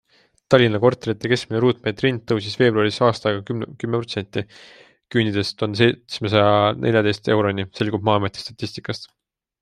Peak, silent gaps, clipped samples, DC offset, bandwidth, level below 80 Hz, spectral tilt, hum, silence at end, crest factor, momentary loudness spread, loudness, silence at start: -2 dBFS; none; under 0.1%; under 0.1%; 11 kHz; -58 dBFS; -6.5 dB/octave; none; 0.55 s; 20 dB; 12 LU; -20 LUFS; 0.5 s